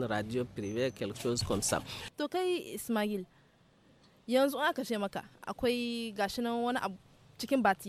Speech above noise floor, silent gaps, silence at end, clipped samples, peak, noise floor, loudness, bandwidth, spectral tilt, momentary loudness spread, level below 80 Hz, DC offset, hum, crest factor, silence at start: 31 dB; none; 0 s; under 0.1%; -16 dBFS; -65 dBFS; -34 LUFS; 16.5 kHz; -4 dB/octave; 11 LU; -60 dBFS; under 0.1%; none; 18 dB; 0 s